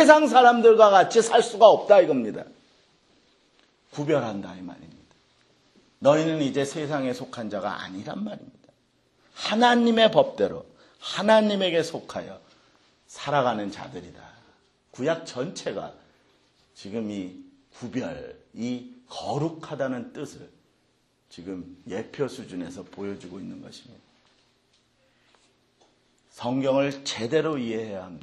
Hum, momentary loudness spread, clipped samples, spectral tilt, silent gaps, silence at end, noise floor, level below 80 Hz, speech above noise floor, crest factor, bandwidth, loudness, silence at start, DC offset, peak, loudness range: none; 23 LU; under 0.1%; -4.5 dB/octave; none; 0.05 s; -67 dBFS; -68 dBFS; 44 dB; 24 dB; 12 kHz; -23 LUFS; 0 s; under 0.1%; 0 dBFS; 15 LU